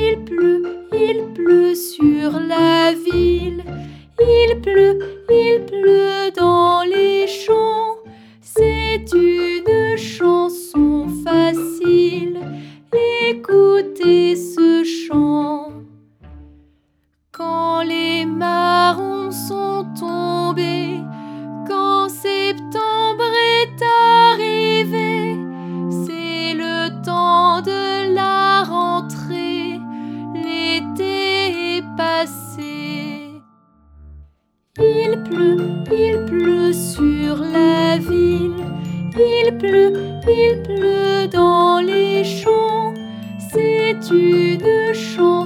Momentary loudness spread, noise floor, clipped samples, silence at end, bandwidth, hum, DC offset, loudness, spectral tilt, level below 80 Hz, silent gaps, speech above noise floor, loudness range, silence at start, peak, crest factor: 12 LU; -64 dBFS; under 0.1%; 0 s; 15.5 kHz; none; under 0.1%; -16 LUFS; -5.5 dB/octave; -40 dBFS; none; 50 dB; 6 LU; 0 s; 0 dBFS; 16 dB